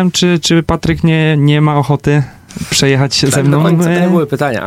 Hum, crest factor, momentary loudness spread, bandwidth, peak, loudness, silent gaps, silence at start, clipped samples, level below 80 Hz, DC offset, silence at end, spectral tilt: none; 10 dB; 5 LU; 15.5 kHz; 0 dBFS; -11 LUFS; none; 0 s; under 0.1%; -36 dBFS; under 0.1%; 0 s; -5.5 dB/octave